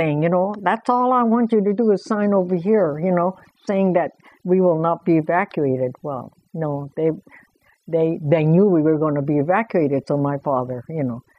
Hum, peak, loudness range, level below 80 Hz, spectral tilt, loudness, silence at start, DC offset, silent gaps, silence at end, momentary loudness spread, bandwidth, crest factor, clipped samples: none; -4 dBFS; 4 LU; -64 dBFS; -9.5 dB/octave; -20 LUFS; 0 s; under 0.1%; none; 0.2 s; 9 LU; 9 kHz; 16 dB; under 0.1%